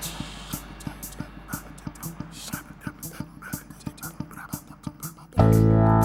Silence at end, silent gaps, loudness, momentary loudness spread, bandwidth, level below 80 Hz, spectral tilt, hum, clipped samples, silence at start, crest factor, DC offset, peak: 0 s; none; -28 LUFS; 20 LU; 19 kHz; -40 dBFS; -6.5 dB/octave; none; under 0.1%; 0 s; 20 dB; under 0.1%; -6 dBFS